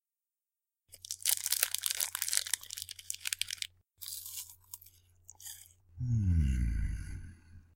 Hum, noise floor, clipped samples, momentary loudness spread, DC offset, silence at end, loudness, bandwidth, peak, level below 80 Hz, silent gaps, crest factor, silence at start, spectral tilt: none; under -90 dBFS; under 0.1%; 19 LU; under 0.1%; 0.15 s; -34 LUFS; 17 kHz; -6 dBFS; -42 dBFS; none; 32 dB; 0.9 s; -2 dB/octave